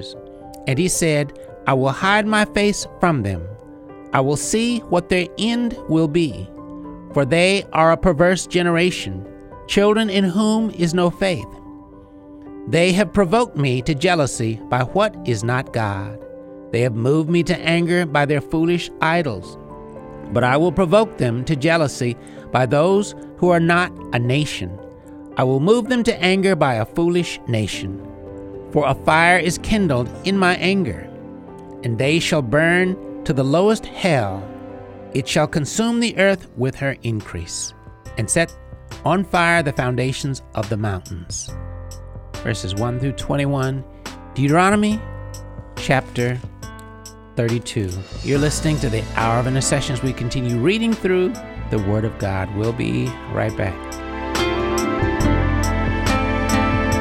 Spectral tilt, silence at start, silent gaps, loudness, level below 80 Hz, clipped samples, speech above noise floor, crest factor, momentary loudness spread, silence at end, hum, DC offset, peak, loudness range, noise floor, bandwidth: -5.5 dB/octave; 0 s; none; -19 LUFS; -36 dBFS; under 0.1%; 23 dB; 18 dB; 18 LU; 0 s; none; under 0.1%; -2 dBFS; 4 LU; -42 dBFS; 16 kHz